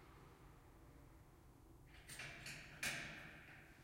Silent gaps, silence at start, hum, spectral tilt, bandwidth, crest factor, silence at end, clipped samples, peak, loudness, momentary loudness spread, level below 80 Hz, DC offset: none; 0 s; none; -2 dB/octave; 16 kHz; 24 dB; 0 s; under 0.1%; -32 dBFS; -50 LUFS; 21 LU; -68 dBFS; under 0.1%